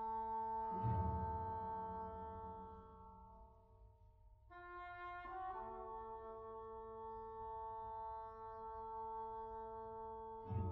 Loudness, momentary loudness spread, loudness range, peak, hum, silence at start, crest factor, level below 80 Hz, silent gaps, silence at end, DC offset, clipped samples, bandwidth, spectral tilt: -48 LUFS; 18 LU; 9 LU; -30 dBFS; none; 0 s; 18 dB; -60 dBFS; none; 0 s; under 0.1%; under 0.1%; 5.2 kHz; -8 dB/octave